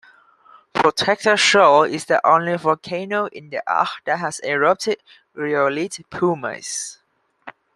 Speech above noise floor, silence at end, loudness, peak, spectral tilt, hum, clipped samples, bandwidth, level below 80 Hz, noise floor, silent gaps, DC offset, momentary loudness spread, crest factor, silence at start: 32 dB; 0.25 s; -19 LUFS; -2 dBFS; -3 dB/octave; none; under 0.1%; 12.5 kHz; -64 dBFS; -51 dBFS; none; under 0.1%; 13 LU; 18 dB; 0.75 s